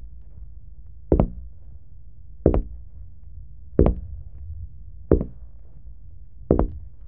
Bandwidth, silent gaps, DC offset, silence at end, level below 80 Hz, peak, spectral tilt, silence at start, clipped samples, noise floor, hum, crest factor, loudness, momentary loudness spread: 3.3 kHz; none; 1%; 0 s; -32 dBFS; 0 dBFS; -11.5 dB/octave; 0 s; under 0.1%; -46 dBFS; none; 26 dB; -24 LUFS; 25 LU